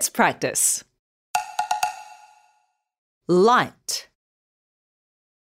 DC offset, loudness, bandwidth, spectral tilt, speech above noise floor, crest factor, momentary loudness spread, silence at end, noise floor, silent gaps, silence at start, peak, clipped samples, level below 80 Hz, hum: under 0.1%; -22 LUFS; 16 kHz; -3 dB/octave; 47 dB; 22 dB; 12 LU; 1.4 s; -67 dBFS; 0.99-1.34 s, 2.98-3.21 s; 0 s; -2 dBFS; under 0.1%; -70 dBFS; none